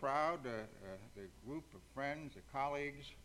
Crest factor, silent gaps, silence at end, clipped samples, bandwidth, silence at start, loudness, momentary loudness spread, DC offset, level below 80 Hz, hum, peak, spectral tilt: 20 dB; none; 0 s; under 0.1%; 16 kHz; 0 s; -44 LUFS; 15 LU; under 0.1%; -66 dBFS; none; -24 dBFS; -5.5 dB/octave